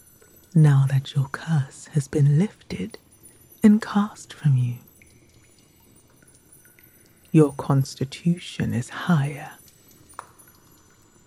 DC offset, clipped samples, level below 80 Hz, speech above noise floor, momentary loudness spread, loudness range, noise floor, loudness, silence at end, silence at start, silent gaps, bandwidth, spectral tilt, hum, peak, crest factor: under 0.1%; under 0.1%; -58 dBFS; 34 dB; 18 LU; 6 LU; -55 dBFS; -22 LUFS; 1.75 s; 0.55 s; none; 13.5 kHz; -7.5 dB/octave; none; -4 dBFS; 20 dB